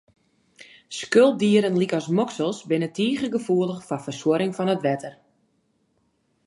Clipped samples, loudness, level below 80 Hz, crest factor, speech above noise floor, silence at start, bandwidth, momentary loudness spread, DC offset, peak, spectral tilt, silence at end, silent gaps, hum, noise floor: under 0.1%; -23 LUFS; -70 dBFS; 20 dB; 46 dB; 0.9 s; 11.5 kHz; 13 LU; under 0.1%; -4 dBFS; -6 dB/octave; 1.35 s; none; none; -68 dBFS